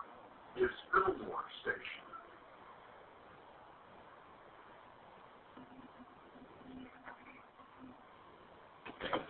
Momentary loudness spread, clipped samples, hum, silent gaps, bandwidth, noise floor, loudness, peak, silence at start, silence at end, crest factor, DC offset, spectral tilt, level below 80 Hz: 21 LU; under 0.1%; none; none; 4.3 kHz; -59 dBFS; -40 LUFS; -18 dBFS; 0 s; 0 s; 26 dB; under 0.1%; -2 dB/octave; -70 dBFS